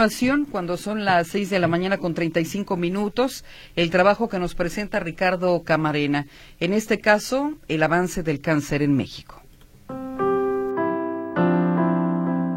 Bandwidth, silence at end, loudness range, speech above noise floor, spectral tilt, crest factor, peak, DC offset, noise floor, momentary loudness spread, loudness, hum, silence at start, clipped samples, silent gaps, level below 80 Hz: 16 kHz; 0 s; 2 LU; 21 dB; -6 dB/octave; 18 dB; -4 dBFS; under 0.1%; -44 dBFS; 8 LU; -22 LUFS; none; 0 s; under 0.1%; none; -46 dBFS